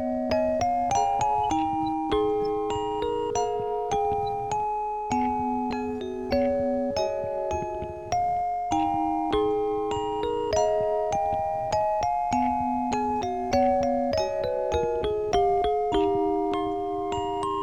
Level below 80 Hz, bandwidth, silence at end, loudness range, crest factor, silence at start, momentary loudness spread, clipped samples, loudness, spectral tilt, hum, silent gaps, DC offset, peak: -46 dBFS; 10.5 kHz; 0 s; 2 LU; 14 dB; 0 s; 5 LU; under 0.1%; -26 LUFS; -5.5 dB/octave; none; none; 0.2%; -10 dBFS